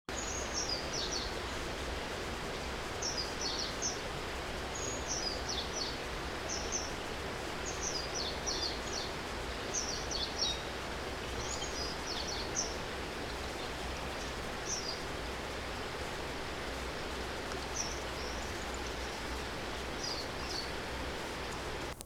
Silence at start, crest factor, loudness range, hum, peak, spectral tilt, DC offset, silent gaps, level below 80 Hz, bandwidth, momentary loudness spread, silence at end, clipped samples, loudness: 0.1 s; 18 dB; 3 LU; none; -20 dBFS; -2.5 dB/octave; under 0.1%; none; -48 dBFS; 18.5 kHz; 5 LU; 0 s; under 0.1%; -37 LUFS